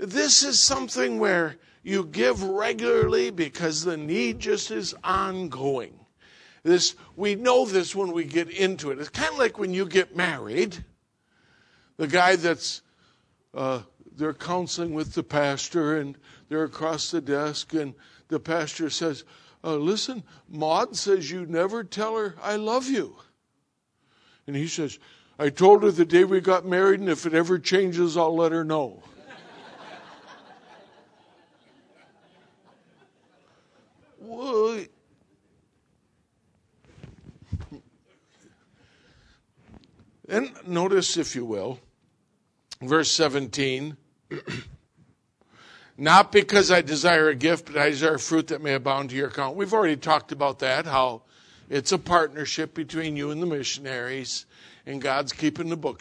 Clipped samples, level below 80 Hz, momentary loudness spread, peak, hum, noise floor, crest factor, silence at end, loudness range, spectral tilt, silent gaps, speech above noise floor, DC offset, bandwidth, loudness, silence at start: under 0.1%; -58 dBFS; 16 LU; -2 dBFS; none; -74 dBFS; 24 dB; 0.05 s; 12 LU; -3.5 dB/octave; none; 50 dB; under 0.1%; 10.5 kHz; -24 LUFS; 0 s